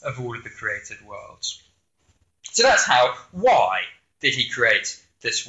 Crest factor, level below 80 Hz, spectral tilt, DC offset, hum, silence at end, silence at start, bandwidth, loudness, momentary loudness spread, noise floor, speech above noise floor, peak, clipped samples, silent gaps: 18 dB; -58 dBFS; -1.5 dB/octave; under 0.1%; none; 0 s; 0 s; 8.2 kHz; -21 LUFS; 17 LU; -66 dBFS; 44 dB; -4 dBFS; under 0.1%; none